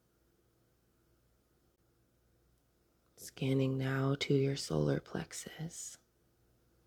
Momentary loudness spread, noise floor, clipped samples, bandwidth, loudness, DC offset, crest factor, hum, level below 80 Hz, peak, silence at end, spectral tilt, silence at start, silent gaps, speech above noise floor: 14 LU; -74 dBFS; under 0.1%; 15.5 kHz; -35 LUFS; under 0.1%; 20 dB; none; -66 dBFS; -20 dBFS; 0.9 s; -5.5 dB/octave; 3.2 s; none; 39 dB